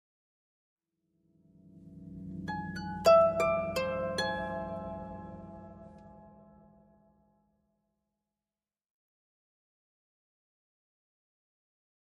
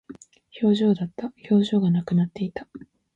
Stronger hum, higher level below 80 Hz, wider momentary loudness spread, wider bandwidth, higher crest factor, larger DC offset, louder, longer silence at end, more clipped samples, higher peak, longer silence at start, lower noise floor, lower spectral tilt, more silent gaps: neither; about the same, -62 dBFS vs -62 dBFS; first, 26 LU vs 14 LU; first, 13 kHz vs 7.8 kHz; first, 24 dB vs 16 dB; neither; second, -30 LUFS vs -23 LUFS; first, 5.75 s vs 0.35 s; neither; second, -12 dBFS vs -8 dBFS; first, 1.75 s vs 0.1 s; first, under -90 dBFS vs -46 dBFS; second, -5 dB/octave vs -8.5 dB/octave; neither